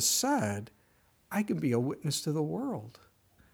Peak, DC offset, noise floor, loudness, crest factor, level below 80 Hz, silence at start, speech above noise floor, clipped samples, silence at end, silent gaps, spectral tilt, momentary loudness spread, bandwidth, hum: -16 dBFS; under 0.1%; -67 dBFS; -32 LUFS; 16 dB; -72 dBFS; 0 s; 36 dB; under 0.1%; 0.6 s; none; -4 dB/octave; 13 LU; over 20 kHz; none